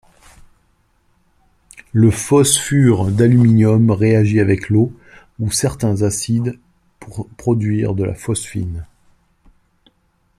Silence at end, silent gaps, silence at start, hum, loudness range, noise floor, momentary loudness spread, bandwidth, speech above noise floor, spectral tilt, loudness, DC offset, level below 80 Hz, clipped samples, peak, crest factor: 1.55 s; none; 1.95 s; none; 9 LU; -61 dBFS; 13 LU; 14 kHz; 46 dB; -6 dB/octave; -16 LUFS; under 0.1%; -44 dBFS; under 0.1%; 0 dBFS; 16 dB